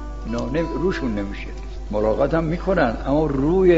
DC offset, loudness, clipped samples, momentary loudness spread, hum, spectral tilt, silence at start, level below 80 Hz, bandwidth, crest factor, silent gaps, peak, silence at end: 0.6%; -22 LUFS; under 0.1%; 10 LU; none; -8 dB/octave; 0 s; -30 dBFS; 7.8 kHz; 16 dB; none; -4 dBFS; 0 s